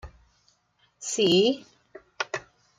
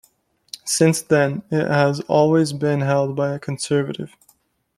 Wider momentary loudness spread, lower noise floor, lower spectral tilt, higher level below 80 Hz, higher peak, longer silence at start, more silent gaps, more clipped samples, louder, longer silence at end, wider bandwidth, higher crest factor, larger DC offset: first, 16 LU vs 13 LU; first, -68 dBFS vs -60 dBFS; second, -3.5 dB/octave vs -5.5 dB/octave; about the same, -58 dBFS vs -60 dBFS; second, -10 dBFS vs -2 dBFS; second, 0.05 s vs 0.65 s; neither; neither; second, -26 LUFS vs -19 LUFS; second, 0.4 s vs 0.7 s; about the same, 14 kHz vs 15 kHz; about the same, 18 dB vs 18 dB; neither